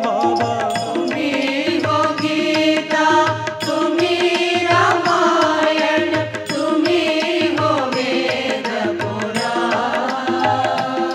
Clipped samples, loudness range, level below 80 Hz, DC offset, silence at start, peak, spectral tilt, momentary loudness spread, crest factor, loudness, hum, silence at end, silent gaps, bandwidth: under 0.1%; 3 LU; -64 dBFS; under 0.1%; 0 s; -2 dBFS; -4.5 dB/octave; 6 LU; 14 dB; -17 LUFS; none; 0 s; none; 13.5 kHz